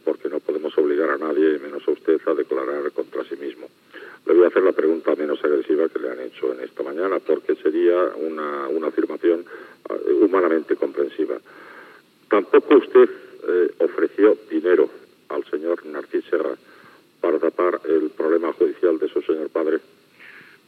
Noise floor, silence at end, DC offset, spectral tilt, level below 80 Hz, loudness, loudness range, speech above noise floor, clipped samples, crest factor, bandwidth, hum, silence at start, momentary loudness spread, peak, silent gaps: -50 dBFS; 0.3 s; under 0.1%; -6.5 dB/octave; under -90 dBFS; -21 LUFS; 4 LU; 30 dB; under 0.1%; 18 dB; 4.7 kHz; none; 0.05 s; 13 LU; -2 dBFS; none